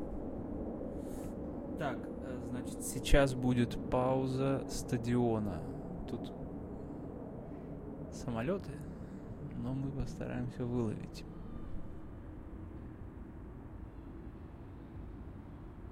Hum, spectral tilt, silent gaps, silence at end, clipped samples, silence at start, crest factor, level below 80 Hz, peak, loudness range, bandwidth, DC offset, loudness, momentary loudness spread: none; -6.5 dB/octave; none; 0 s; under 0.1%; 0 s; 26 dB; -46 dBFS; -10 dBFS; 16 LU; 16 kHz; under 0.1%; -38 LUFS; 17 LU